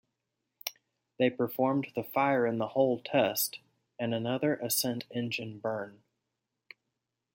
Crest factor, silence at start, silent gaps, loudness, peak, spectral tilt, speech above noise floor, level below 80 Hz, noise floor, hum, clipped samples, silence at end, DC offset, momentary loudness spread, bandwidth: 22 dB; 0.65 s; none; -31 LUFS; -12 dBFS; -4.5 dB/octave; 55 dB; -78 dBFS; -85 dBFS; none; under 0.1%; 1.4 s; under 0.1%; 12 LU; 17 kHz